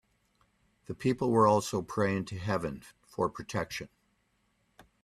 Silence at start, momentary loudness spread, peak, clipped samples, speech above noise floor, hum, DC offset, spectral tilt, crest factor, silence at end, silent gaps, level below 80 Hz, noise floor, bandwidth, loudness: 0.9 s; 19 LU; -12 dBFS; under 0.1%; 44 dB; none; under 0.1%; -6 dB/octave; 20 dB; 1.15 s; none; -62 dBFS; -74 dBFS; 14.5 kHz; -31 LUFS